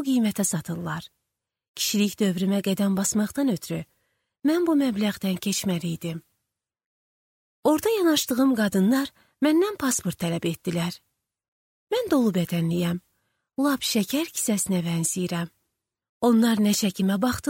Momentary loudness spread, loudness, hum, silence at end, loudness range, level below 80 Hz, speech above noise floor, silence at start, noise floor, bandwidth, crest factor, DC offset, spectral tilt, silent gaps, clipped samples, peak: 10 LU; -24 LUFS; none; 0 s; 4 LU; -60 dBFS; 60 dB; 0 s; -83 dBFS; 17 kHz; 16 dB; under 0.1%; -4.5 dB/octave; 1.68-1.74 s, 6.86-7.63 s, 11.48-11.87 s, 16.09-16.21 s; under 0.1%; -10 dBFS